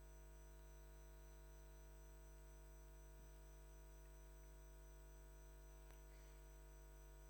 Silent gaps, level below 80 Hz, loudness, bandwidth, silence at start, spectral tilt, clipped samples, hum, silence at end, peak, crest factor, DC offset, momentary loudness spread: none; -62 dBFS; -64 LUFS; 19 kHz; 0 s; -5 dB/octave; under 0.1%; 50 Hz at -60 dBFS; 0 s; -46 dBFS; 16 dB; under 0.1%; 0 LU